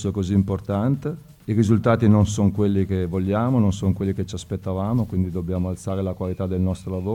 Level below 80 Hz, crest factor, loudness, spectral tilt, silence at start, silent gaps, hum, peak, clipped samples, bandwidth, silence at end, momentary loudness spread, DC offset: -44 dBFS; 16 dB; -22 LUFS; -8 dB/octave; 0 s; none; none; -4 dBFS; under 0.1%; 11 kHz; 0 s; 9 LU; under 0.1%